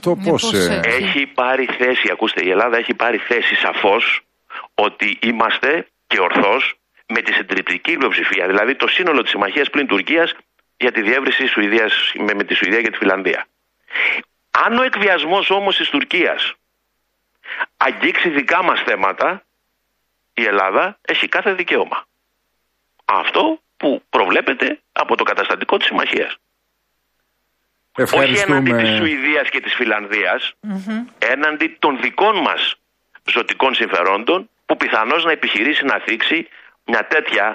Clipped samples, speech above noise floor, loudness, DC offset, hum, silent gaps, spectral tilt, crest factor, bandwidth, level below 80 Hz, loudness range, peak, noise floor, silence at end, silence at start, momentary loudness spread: under 0.1%; 53 dB; -16 LUFS; under 0.1%; none; none; -4 dB/octave; 16 dB; 15.5 kHz; -62 dBFS; 3 LU; -2 dBFS; -70 dBFS; 0 s; 0.05 s; 7 LU